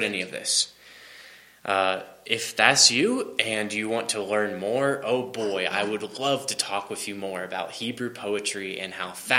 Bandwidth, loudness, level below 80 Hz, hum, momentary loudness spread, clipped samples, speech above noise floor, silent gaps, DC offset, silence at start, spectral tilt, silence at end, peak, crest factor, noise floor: 16.5 kHz; -25 LUFS; -72 dBFS; none; 13 LU; under 0.1%; 23 dB; none; under 0.1%; 0 s; -1.5 dB/octave; 0 s; 0 dBFS; 26 dB; -49 dBFS